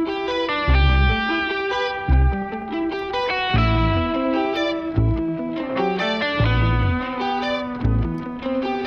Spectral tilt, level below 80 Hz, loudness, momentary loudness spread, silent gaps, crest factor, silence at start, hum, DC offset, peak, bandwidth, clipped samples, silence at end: -7.5 dB/octave; -26 dBFS; -21 LUFS; 7 LU; none; 14 dB; 0 s; none; under 0.1%; -6 dBFS; 6.6 kHz; under 0.1%; 0 s